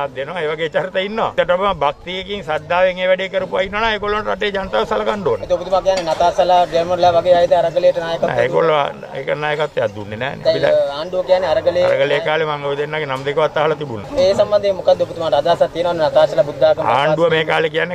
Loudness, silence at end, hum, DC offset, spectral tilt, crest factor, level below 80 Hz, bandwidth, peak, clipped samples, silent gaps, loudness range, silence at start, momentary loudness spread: -17 LUFS; 0 s; none; under 0.1%; -5 dB/octave; 14 dB; -44 dBFS; 9.6 kHz; -2 dBFS; under 0.1%; none; 3 LU; 0 s; 7 LU